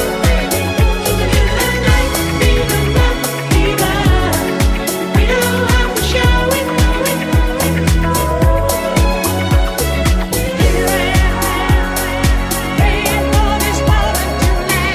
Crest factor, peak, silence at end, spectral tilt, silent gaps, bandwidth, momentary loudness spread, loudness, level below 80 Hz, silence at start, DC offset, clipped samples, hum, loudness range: 12 dB; 0 dBFS; 0 s; -4.5 dB/octave; none; 16 kHz; 3 LU; -14 LUFS; -16 dBFS; 0 s; under 0.1%; under 0.1%; none; 1 LU